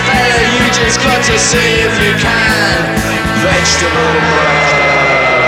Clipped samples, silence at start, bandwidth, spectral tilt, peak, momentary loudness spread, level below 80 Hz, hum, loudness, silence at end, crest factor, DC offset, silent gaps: under 0.1%; 0 s; 17 kHz; -3 dB/octave; 0 dBFS; 3 LU; -28 dBFS; none; -9 LUFS; 0 s; 10 dB; under 0.1%; none